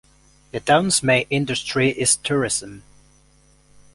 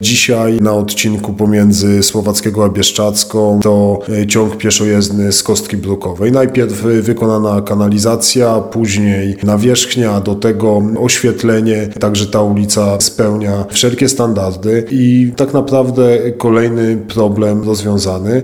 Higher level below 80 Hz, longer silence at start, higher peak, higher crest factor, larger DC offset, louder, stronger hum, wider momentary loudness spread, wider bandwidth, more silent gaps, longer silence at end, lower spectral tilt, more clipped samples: second, -52 dBFS vs -44 dBFS; first, 0.55 s vs 0 s; second, -4 dBFS vs 0 dBFS; first, 20 dB vs 12 dB; second, under 0.1% vs 0.2%; second, -19 LUFS vs -12 LUFS; neither; first, 10 LU vs 5 LU; second, 11.5 kHz vs 18.5 kHz; neither; first, 1.15 s vs 0 s; second, -3 dB/octave vs -4.5 dB/octave; neither